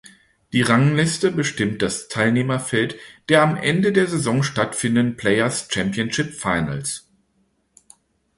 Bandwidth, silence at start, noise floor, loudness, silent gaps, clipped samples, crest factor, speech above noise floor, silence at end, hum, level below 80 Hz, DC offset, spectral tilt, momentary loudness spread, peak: 11.5 kHz; 0.55 s; -66 dBFS; -20 LUFS; none; under 0.1%; 20 dB; 46 dB; 1.4 s; none; -52 dBFS; under 0.1%; -5 dB/octave; 8 LU; -2 dBFS